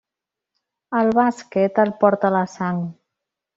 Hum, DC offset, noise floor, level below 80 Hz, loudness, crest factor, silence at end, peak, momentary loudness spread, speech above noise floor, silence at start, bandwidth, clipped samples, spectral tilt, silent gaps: none; under 0.1%; -86 dBFS; -64 dBFS; -20 LUFS; 18 dB; 0.65 s; -2 dBFS; 8 LU; 67 dB; 0.9 s; 7.8 kHz; under 0.1%; -7.5 dB/octave; none